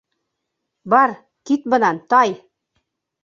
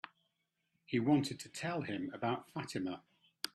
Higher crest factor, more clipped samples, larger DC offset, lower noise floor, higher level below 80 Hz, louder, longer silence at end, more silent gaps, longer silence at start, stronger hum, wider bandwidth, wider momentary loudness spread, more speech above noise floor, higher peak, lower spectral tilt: about the same, 18 dB vs 22 dB; neither; neither; second, -78 dBFS vs -83 dBFS; first, -68 dBFS vs -76 dBFS; first, -17 LUFS vs -38 LUFS; first, 0.85 s vs 0.05 s; neither; first, 0.85 s vs 0.05 s; neither; second, 7.6 kHz vs 13.5 kHz; about the same, 11 LU vs 12 LU; first, 61 dB vs 46 dB; first, -2 dBFS vs -16 dBFS; about the same, -5 dB/octave vs -5.5 dB/octave